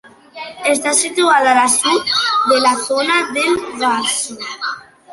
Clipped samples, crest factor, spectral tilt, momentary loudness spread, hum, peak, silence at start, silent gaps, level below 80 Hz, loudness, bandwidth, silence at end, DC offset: under 0.1%; 16 dB; -0.5 dB/octave; 12 LU; none; 0 dBFS; 0.35 s; none; -60 dBFS; -14 LUFS; 12 kHz; 0 s; under 0.1%